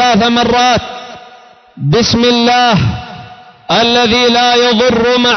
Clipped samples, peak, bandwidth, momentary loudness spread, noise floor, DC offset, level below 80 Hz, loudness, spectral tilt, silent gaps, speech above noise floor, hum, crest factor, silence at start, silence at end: under 0.1%; -2 dBFS; 6.4 kHz; 17 LU; -39 dBFS; under 0.1%; -36 dBFS; -10 LUFS; -4.5 dB/octave; none; 29 dB; none; 10 dB; 0 s; 0 s